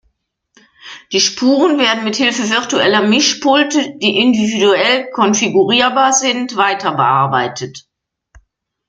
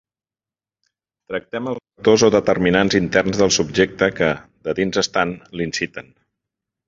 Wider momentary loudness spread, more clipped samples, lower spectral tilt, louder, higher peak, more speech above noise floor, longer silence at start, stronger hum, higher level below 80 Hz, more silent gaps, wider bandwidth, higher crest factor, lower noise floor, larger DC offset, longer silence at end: second, 5 LU vs 12 LU; neither; about the same, -3 dB/octave vs -4 dB/octave; first, -13 LUFS vs -19 LUFS; about the same, 0 dBFS vs -2 dBFS; second, 51 dB vs over 72 dB; second, 0.85 s vs 1.3 s; neither; second, -58 dBFS vs -48 dBFS; neither; first, 9.4 kHz vs 7.8 kHz; about the same, 14 dB vs 18 dB; second, -64 dBFS vs under -90 dBFS; neither; first, 1.1 s vs 0.85 s